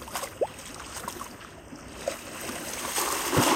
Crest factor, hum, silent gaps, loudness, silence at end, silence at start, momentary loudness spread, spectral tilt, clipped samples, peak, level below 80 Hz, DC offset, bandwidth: 20 dB; none; none; -31 LUFS; 0 s; 0 s; 17 LU; -3 dB/octave; under 0.1%; -12 dBFS; -54 dBFS; under 0.1%; 16.5 kHz